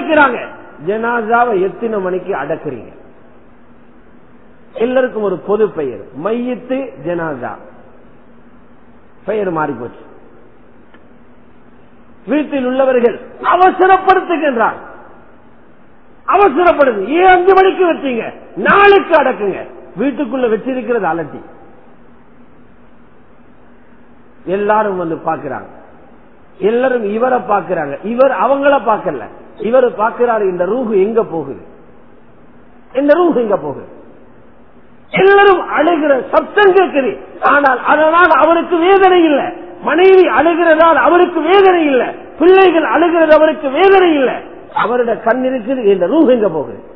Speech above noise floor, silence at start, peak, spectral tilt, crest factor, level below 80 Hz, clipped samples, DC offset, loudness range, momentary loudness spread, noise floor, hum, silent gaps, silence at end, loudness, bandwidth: 33 dB; 0 s; 0 dBFS; -8.5 dB/octave; 14 dB; -48 dBFS; 0.2%; 1%; 13 LU; 14 LU; -45 dBFS; none; none; 0.05 s; -12 LUFS; 5.4 kHz